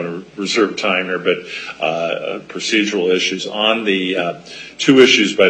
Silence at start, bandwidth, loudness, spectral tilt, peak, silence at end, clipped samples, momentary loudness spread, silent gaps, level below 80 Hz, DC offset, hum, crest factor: 0 s; 9.2 kHz; -16 LUFS; -3.5 dB/octave; 0 dBFS; 0 s; under 0.1%; 15 LU; none; -62 dBFS; under 0.1%; none; 16 dB